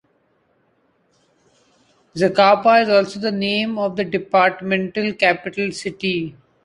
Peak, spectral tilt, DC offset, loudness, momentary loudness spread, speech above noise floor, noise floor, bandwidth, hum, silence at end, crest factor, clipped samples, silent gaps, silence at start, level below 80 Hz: -2 dBFS; -5 dB/octave; under 0.1%; -18 LUFS; 11 LU; 45 dB; -63 dBFS; 11 kHz; none; 0.35 s; 18 dB; under 0.1%; none; 2.15 s; -62 dBFS